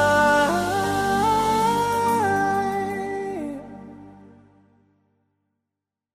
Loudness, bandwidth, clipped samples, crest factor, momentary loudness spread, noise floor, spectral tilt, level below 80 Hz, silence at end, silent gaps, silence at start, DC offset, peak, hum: -21 LUFS; 15.5 kHz; under 0.1%; 16 dB; 16 LU; -85 dBFS; -4.5 dB/octave; -50 dBFS; 2 s; none; 0 s; under 0.1%; -8 dBFS; 50 Hz at -55 dBFS